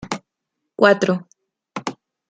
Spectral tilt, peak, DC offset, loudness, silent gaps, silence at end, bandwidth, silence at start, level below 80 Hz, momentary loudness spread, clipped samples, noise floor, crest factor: -5 dB/octave; -2 dBFS; under 0.1%; -20 LUFS; none; 0.35 s; 9.2 kHz; 0 s; -62 dBFS; 19 LU; under 0.1%; -79 dBFS; 20 dB